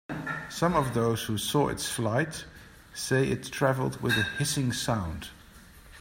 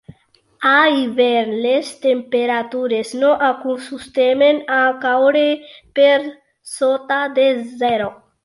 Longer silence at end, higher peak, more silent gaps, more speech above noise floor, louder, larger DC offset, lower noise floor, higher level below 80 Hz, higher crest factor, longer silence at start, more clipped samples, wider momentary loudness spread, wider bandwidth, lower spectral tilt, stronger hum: second, 0 s vs 0.3 s; second, -10 dBFS vs -2 dBFS; neither; second, 23 dB vs 39 dB; second, -28 LUFS vs -17 LUFS; neither; second, -51 dBFS vs -55 dBFS; first, -52 dBFS vs -62 dBFS; about the same, 18 dB vs 14 dB; second, 0.1 s vs 0.6 s; neither; about the same, 11 LU vs 10 LU; first, 16.5 kHz vs 11.5 kHz; about the same, -4.5 dB/octave vs -3.5 dB/octave; neither